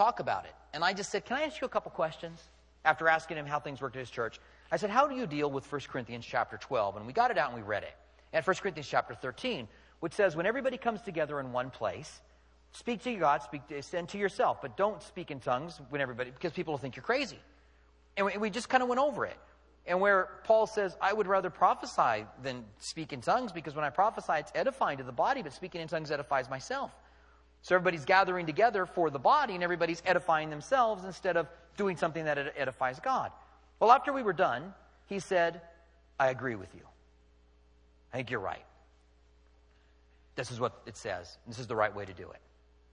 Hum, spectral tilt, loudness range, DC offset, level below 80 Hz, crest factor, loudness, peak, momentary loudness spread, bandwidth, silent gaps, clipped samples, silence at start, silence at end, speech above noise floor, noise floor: none; -4.5 dB/octave; 8 LU; under 0.1%; -64 dBFS; 24 dB; -32 LUFS; -8 dBFS; 14 LU; 11 kHz; none; under 0.1%; 0 s; 0.55 s; 31 dB; -63 dBFS